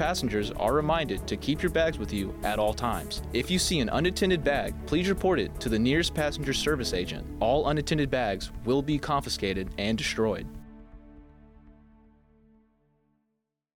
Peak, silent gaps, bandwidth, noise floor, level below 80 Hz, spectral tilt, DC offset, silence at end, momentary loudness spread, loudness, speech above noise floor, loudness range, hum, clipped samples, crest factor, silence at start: -12 dBFS; none; 17.5 kHz; -81 dBFS; -42 dBFS; -5 dB/octave; under 0.1%; 2.05 s; 6 LU; -28 LUFS; 53 dB; 6 LU; none; under 0.1%; 16 dB; 0 s